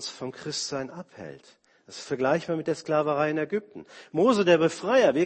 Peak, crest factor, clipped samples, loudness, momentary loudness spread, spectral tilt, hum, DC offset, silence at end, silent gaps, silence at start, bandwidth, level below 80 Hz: -8 dBFS; 18 dB; under 0.1%; -26 LUFS; 21 LU; -5 dB/octave; none; under 0.1%; 0 s; none; 0 s; 8.8 kHz; -68 dBFS